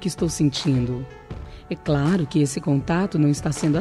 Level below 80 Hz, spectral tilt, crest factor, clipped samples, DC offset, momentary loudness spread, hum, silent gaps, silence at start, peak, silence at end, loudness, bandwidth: -42 dBFS; -6 dB/octave; 12 dB; under 0.1%; under 0.1%; 15 LU; none; none; 0 s; -8 dBFS; 0 s; -22 LUFS; 12.5 kHz